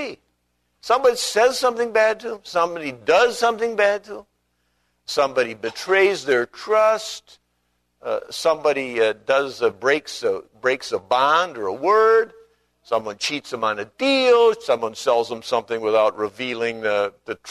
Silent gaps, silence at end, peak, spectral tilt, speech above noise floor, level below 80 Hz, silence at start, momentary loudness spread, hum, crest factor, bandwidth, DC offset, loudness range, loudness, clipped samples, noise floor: none; 0 s; -4 dBFS; -2.5 dB/octave; 50 dB; -64 dBFS; 0 s; 10 LU; 60 Hz at -65 dBFS; 18 dB; 13.5 kHz; under 0.1%; 2 LU; -20 LUFS; under 0.1%; -70 dBFS